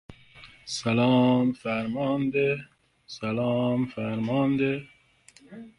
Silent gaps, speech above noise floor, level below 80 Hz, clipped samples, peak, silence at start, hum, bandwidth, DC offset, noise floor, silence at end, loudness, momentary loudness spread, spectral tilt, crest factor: none; 32 dB; -62 dBFS; under 0.1%; -10 dBFS; 0.1 s; none; 11 kHz; under 0.1%; -57 dBFS; 0.1 s; -26 LUFS; 13 LU; -6.5 dB/octave; 16 dB